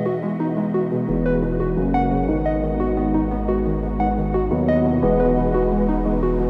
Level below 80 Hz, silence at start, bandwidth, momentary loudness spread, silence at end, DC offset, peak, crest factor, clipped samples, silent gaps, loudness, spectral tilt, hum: -26 dBFS; 0 s; 4.4 kHz; 4 LU; 0 s; under 0.1%; -8 dBFS; 12 dB; under 0.1%; none; -21 LUFS; -11 dB/octave; none